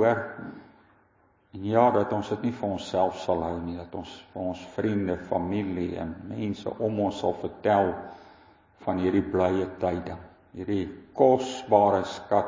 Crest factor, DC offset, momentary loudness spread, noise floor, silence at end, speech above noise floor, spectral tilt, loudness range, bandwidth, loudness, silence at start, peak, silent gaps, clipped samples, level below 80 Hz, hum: 22 dB; under 0.1%; 17 LU; -64 dBFS; 0 s; 37 dB; -7 dB/octave; 5 LU; 7.6 kHz; -27 LUFS; 0 s; -6 dBFS; none; under 0.1%; -52 dBFS; none